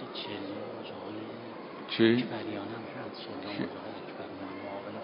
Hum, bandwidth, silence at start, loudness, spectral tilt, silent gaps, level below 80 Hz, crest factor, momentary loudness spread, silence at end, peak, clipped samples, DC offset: none; 5.2 kHz; 0 s; -35 LUFS; -4 dB/octave; none; -72 dBFS; 24 dB; 16 LU; 0 s; -10 dBFS; under 0.1%; under 0.1%